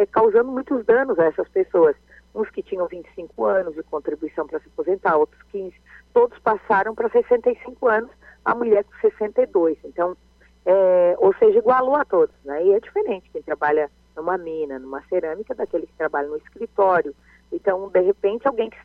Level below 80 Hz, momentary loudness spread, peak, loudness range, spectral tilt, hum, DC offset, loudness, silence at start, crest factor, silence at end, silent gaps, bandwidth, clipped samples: -56 dBFS; 13 LU; -6 dBFS; 6 LU; -8 dB/octave; 60 Hz at -55 dBFS; under 0.1%; -21 LUFS; 0 s; 14 dB; 0.15 s; none; 4.3 kHz; under 0.1%